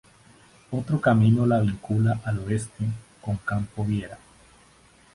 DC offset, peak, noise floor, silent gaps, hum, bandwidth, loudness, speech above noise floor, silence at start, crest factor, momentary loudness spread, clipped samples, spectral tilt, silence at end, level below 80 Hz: under 0.1%; -8 dBFS; -56 dBFS; none; none; 11.5 kHz; -25 LUFS; 32 dB; 0.7 s; 18 dB; 13 LU; under 0.1%; -8 dB/octave; 1 s; -50 dBFS